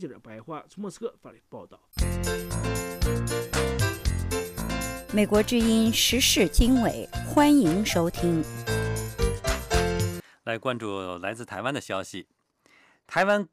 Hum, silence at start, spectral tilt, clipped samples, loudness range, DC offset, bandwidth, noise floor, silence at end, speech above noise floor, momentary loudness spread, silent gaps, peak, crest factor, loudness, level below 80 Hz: none; 0 s; -4.5 dB/octave; under 0.1%; 9 LU; under 0.1%; 15.5 kHz; -61 dBFS; 0.05 s; 36 dB; 18 LU; none; -10 dBFS; 16 dB; -25 LUFS; -36 dBFS